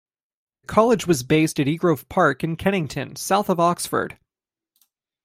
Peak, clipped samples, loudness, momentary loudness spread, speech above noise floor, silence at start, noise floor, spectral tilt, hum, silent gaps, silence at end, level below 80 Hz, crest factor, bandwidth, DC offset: -2 dBFS; under 0.1%; -21 LUFS; 7 LU; over 70 dB; 0.7 s; under -90 dBFS; -5.5 dB/octave; none; none; 1.15 s; -54 dBFS; 20 dB; 16.5 kHz; under 0.1%